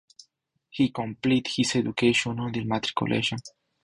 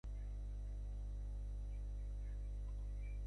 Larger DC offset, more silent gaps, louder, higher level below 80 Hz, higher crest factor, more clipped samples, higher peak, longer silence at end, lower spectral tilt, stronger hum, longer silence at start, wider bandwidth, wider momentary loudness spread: neither; neither; first, -26 LUFS vs -49 LUFS; second, -58 dBFS vs -44 dBFS; first, 18 dB vs 6 dB; neither; first, -8 dBFS vs -40 dBFS; first, 0.35 s vs 0 s; second, -4.5 dB/octave vs -7.5 dB/octave; second, none vs 50 Hz at -45 dBFS; first, 0.75 s vs 0.05 s; first, 11 kHz vs 6.2 kHz; first, 7 LU vs 1 LU